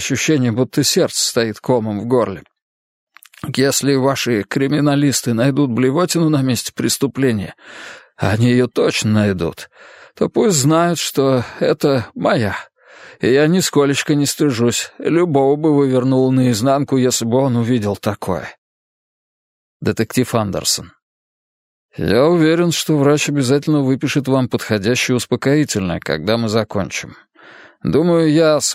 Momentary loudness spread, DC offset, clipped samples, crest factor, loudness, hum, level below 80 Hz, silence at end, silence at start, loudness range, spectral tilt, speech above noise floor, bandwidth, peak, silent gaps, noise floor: 9 LU; under 0.1%; under 0.1%; 16 dB; -16 LUFS; none; -52 dBFS; 0 s; 0 s; 4 LU; -5 dB/octave; 27 dB; 16 kHz; 0 dBFS; 2.62-3.07 s, 18.58-19.80 s, 21.02-21.89 s; -43 dBFS